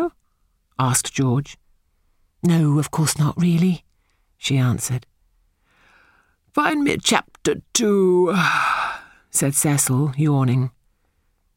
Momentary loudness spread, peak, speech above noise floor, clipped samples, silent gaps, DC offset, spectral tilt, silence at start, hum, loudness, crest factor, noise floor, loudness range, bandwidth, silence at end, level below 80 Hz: 10 LU; 0 dBFS; 47 dB; under 0.1%; none; under 0.1%; -4.5 dB/octave; 0 s; none; -20 LUFS; 20 dB; -66 dBFS; 5 LU; 17 kHz; 0.85 s; -54 dBFS